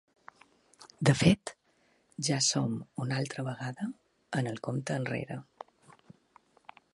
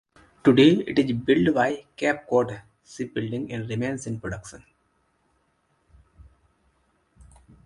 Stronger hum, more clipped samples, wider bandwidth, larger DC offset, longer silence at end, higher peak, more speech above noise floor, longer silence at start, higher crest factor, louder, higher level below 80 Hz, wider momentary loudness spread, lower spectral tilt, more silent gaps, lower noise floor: neither; neither; about the same, 11.5 kHz vs 11 kHz; neither; second, 1.5 s vs 3.1 s; second, -10 dBFS vs -4 dBFS; second, 39 dB vs 46 dB; first, 0.8 s vs 0.45 s; about the same, 24 dB vs 22 dB; second, -31 LUFS vs -23 LUFS; about the same, -60 dBFS vs -56 dBFS; first, 21 LU vs 18 LU; second, -4.5 dB/octave vs -6.5 dB/octave; neither; about the same, -70 dBFS vs -69 dBFS